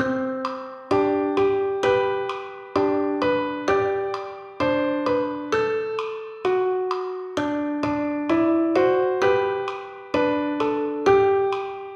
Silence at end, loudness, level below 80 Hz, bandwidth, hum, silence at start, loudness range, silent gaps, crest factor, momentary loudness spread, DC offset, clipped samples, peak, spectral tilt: 0 s; -23 LUFS; -56 dBFS; 7.8 kHz; none; 0 s; 3 LU; none; 18 dB; 9 LU; under 0.1%; under 0.1%; -6 dBFS; -6 dB/octave